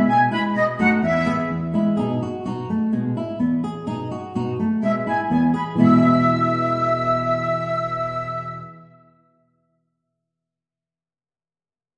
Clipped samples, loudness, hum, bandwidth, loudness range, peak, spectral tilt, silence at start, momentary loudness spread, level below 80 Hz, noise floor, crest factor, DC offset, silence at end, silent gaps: under 0.1%; -21 LUFS; none; 9.2 kHz; 11 LU; -2 dBFS; -8 dB/octave; 0 s; 11 LU; -54 dBFS; under -90 dBFS; 18 dB; under 0.1%; 3.1 s; none